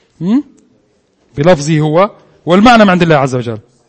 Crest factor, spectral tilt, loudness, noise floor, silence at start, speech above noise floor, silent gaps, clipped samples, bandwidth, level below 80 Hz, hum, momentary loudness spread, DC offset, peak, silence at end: 12 dB; -6.5 dB/octave; -10 LUFS; -54 dBFS; 0.2 s; 46 dB; none; 0.5%; 11 kHz; -40 dBFS; none; 14 LU; under 0.1%; 0 dBFS; 0.3 s